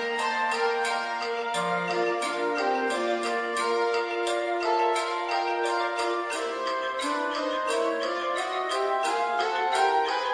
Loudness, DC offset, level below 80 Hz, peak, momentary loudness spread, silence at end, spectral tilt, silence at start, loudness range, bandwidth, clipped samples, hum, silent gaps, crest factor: -27 LUFS; under 0.1%; -70 dBFS; -12 dBFS; 4 LU; 0 s; -2.5 dB/octave; 0 s; 1 LU; 10.5 kHz; under 0.1%; none; none; 16 dB